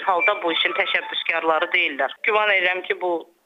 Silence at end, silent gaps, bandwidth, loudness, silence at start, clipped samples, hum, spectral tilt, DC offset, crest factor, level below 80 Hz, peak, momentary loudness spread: 0.2 s; none; 9.2 kHz; -20 LUFS; 0 s; under 0.1%; none; -3.5 dB/octave; under 0.1%; 16 dB; -76 dBFS; -6 dBFS; 6 LU